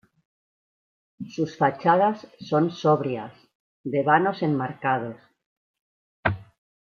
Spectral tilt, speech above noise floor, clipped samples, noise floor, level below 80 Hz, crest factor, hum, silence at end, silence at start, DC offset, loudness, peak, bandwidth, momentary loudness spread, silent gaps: -7.5 dB/octave; over 67 dB; under 0.1%; under -90 dBFS; -62 dBFS; 20 dB; none; 0.5 s; 1.2 s; under 0.1%; -24 LUFS; -6 dBFS; 7 kHz; 17 LU; 3.55-3.84 s, 5.46-5.74 s, 5.81-6.23 s